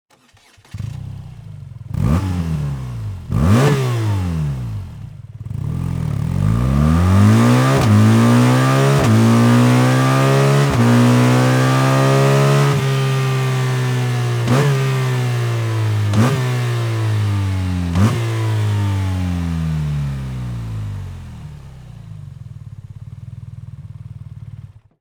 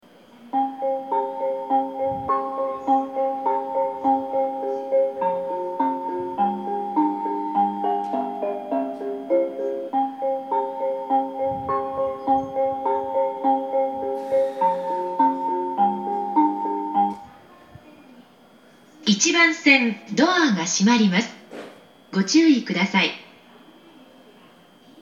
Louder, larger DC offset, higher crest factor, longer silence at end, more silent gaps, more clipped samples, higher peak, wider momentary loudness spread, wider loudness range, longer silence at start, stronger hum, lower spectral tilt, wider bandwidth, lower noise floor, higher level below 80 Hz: first, -16 LUFS vs -22 LUFS; neither; second, 14 dB vs 20 dB; first, 0.35 s vs 0 s; neither; neither; about the same, -2 dBFS vs -2 dBFS; first, 23 LU vs 10 LU; first, 15 LU vs 6 LU; first, 0.75 s vs 0.4 s; neither; first, -6.5 dB/octave vs -4 dB/octave; first, over 20 kHz vs 8.4 kHz; about the same, -51 dBFS vs -52 dBFS; first, -36 dBFS vs -66 dBFS